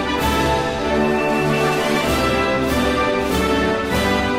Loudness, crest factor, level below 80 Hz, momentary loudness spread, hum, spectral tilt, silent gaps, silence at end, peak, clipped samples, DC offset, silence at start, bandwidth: -18 LUFS; 12 dB; -32 dBFS; 1 LU; none; -5 dB/octave; none; 0 s; -6 dBFS; under 0.1%; under 0.1%; 0 s; 16 kHz